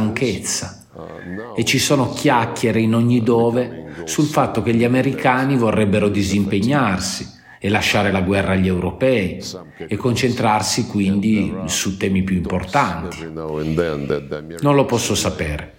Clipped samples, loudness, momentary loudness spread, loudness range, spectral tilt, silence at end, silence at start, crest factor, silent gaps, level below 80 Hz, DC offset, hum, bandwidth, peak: under 0.1%; -18 LUFS; 11 LU; 3 LU; -5 dB/octave; 0.05 s; 0 s; 16 dB; none; -42 dBFS; under 0.1%; none; 17 kHz; -2 dBFS